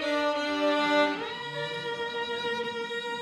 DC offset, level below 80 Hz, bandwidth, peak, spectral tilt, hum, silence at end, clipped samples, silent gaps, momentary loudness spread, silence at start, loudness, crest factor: under 0.1%; -70 dBFS; 13 kHz; -14 dBFS; -3.5 dB/octave; none; 0 s; under 0.1%; none; 9 LU; 0 s; -29 LUFS; 16 dB